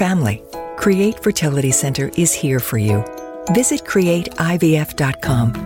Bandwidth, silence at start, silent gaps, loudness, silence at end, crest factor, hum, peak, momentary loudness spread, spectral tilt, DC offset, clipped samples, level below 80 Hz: 17 kHz; 0 s; none; -17 LUFS; 0 s; 14 dB; none; -4 dBFS; 5 LU; -5 dB/octave; under 0.1%; under 0.1%; -42 dBFS